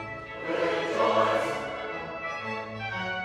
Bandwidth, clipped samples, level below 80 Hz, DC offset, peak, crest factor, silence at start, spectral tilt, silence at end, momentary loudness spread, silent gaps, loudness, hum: 14.5 kHz; under 0.1%; -60 dBFS; under 0.1%; -12 dBFS; 18 dB; 0 s; -4.5 dB/octave; 0 s; 10 LU; none; -29 LUFS; none